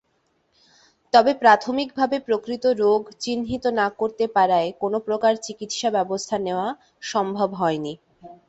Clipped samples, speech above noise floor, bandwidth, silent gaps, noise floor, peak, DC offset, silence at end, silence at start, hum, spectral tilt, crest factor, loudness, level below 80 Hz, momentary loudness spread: under 0.1%; 46 dB; 8.2 kHz; none; -68 dBFS; -2 dBFS; under 0.1%; 0.15 s; 1.15 s; none; -4 dB/octave; 20 dB; -22 LUFS; -60 dBFS; 11 LU